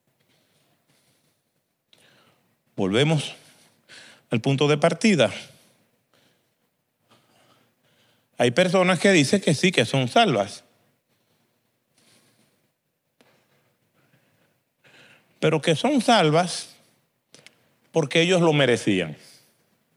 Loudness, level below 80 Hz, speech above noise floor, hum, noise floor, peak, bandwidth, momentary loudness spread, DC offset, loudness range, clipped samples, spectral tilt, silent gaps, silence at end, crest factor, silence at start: -21 LUFS; -76 dBFS; 55 dB; none; -75 dBFS; -4 dBFS; 15 kHz; 13 LU; under 0.1%; 8 LU; under 0.1%; -5 dB/octave; none; 0.8 s; 22 dB; 2.75 s